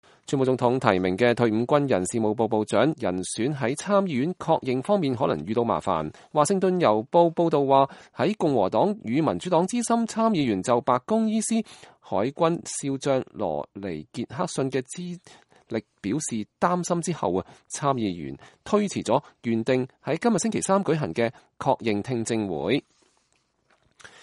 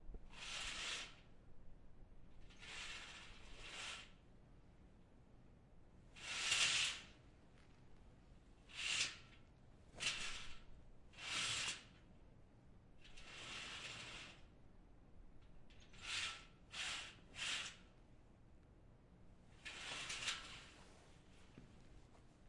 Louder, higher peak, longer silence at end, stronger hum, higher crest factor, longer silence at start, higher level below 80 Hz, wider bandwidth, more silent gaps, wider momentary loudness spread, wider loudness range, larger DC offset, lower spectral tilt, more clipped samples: first, -25 LUFS vs -45 LUFS; first, -2 dBFS vs -24 dBFS; first, 1.4 s vs 0 s; neither; about the same, 22 dB vs 26 dB; first, 0.3 s vs 0 s; about the same, -62 dBFS vs -66 dBFS; about the same, 11.5 kHz vs 11.5 kHz; neither; second, 9 LU vs 27 LU; second, 6 LU vs 12 LU; neither; first, -5.5 dB/octave vs 0 dB/octave; neither